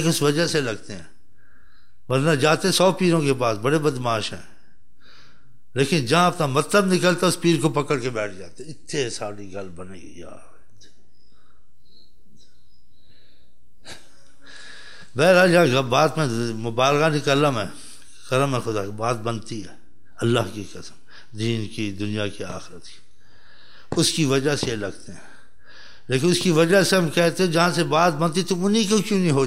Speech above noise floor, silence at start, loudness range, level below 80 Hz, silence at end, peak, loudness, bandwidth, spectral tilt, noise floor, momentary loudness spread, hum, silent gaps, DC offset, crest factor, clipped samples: 40 dB; 0 s; 11 LU; -58 dBFS; 0 s; -4 dBFS; -21 LUFS; 16 kHz; -5 dB/octave; -61 dBFS; 22 LU; none; none; 2%; 18 dB; under 0.1%